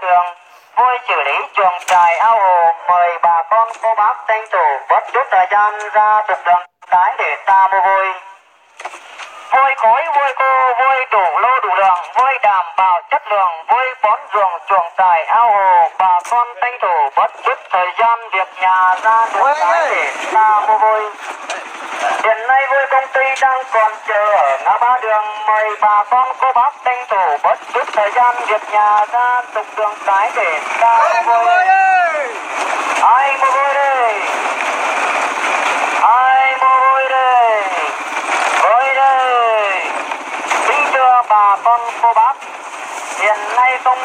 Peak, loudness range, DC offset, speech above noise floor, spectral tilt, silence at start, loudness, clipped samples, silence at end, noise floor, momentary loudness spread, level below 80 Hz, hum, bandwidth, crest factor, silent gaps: 0 dBFS; 2 LU; under 0.1%; 30 dB; 0 dB/octave; 0 s; -13 LUFS; under 0.1%; 0 s; -44 dBFS; 7 LU; -80 dBFS; none; 15 kHz; 14 dB; none